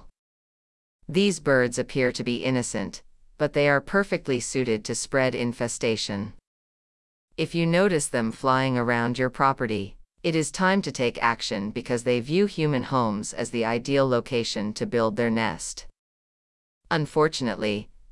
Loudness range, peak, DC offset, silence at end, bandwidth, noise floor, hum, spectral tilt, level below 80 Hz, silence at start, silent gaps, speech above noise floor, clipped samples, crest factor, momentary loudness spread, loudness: 3 LU; -6 dBFS; under 0.1%; 0 s; 12 kHz; under -90 dBFS; none; -5 dB/octave; -54 dBFS; 0.05 s; 0.19-0.99 s, 6.47-7.28 s, 15.99-16.81 s; over 65 dB; under 0.1%; 18 dB; 8 LU; -25 LUFS